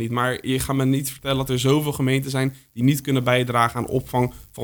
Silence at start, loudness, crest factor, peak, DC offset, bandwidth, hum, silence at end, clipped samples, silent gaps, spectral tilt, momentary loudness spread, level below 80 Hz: 0 s; -22 LUFS; 18 dB; -2 dBFS; under 0.1%; over 20 kHz; none; 0 s; under 0.1%; none; -5.5 dB/octave; 5 LU; -46 dBFS